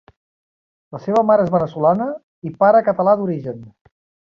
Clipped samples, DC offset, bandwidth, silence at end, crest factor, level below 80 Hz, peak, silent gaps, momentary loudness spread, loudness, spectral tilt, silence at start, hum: under 0.1%; under 0.1%; 6.8 kHz; 0.55 s; 16 dB; -58 dBFS; -2 dBFS; 2.23-2.42 s; 17 LU; -17 LUFS; -9.5 dB/octave; 0.9 s; none